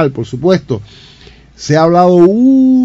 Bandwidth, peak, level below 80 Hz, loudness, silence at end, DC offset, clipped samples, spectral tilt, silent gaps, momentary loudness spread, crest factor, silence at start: 7.8 kHz; 0 dBFS; -44 dBFS; -9 LUFS; 0 s; under 0.1%; 0.8%; -7.5 dB/octave; none; 14 LU; 10 dB; 0 s